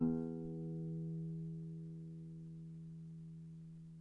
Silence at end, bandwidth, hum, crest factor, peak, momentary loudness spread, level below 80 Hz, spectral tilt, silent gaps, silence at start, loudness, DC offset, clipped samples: 0 s; 1.6 kHz; none; 20 dB; -24 dBFS; 10 LU; -70 dBFS; -11.5 dB/octave; none; 0 s; -47 LUFS; under 0.1%; under 0.1%